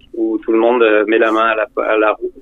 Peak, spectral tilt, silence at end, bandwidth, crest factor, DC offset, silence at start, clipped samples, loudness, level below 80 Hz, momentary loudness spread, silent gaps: -2 dBFS; -5.5 dB/octave; 0 s; 6.6 kHz; 12 dB; under 0.1%; 0.15 s; under 0.1%; -14 LUFS; -52 dBFS; 6 LU; none